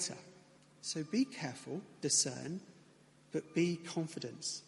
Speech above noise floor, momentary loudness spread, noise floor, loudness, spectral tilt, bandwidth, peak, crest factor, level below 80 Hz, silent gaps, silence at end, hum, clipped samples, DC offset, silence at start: 27 dB; 14 LU; -64 dBFS; -37 LUFS; -3.5 dB/octave; 11.5 kHz; -18 dBFS; 20 dB; -82 dBFS; none; 0.05 s; none; under 0.1%; under 0.1%; 0 s